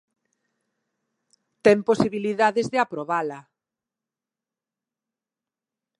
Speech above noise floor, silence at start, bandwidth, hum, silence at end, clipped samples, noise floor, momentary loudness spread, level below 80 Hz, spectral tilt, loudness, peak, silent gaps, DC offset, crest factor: 68 dB; 1.65 s; 11.5 kHz; none; 2.6 s; under 0.1%; -90 dBFS; 8 LU; -66 dBFS; -5.5 dB/octave; -22 LUFS; -4 dBFS; none; under 0.1%; 24 dB